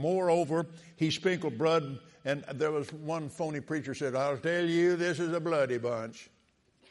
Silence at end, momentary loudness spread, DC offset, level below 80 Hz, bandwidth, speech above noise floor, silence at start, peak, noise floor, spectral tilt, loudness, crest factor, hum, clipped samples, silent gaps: 0.65 s; 9 LU; under 0.1%; -74 dBFS; 11.5 kHz; 38 dB; 0 s; -16 dBFS; -69 dBFS; -6 dB/octave; -31 LUFS; 16 dB; none; under 0.1%; none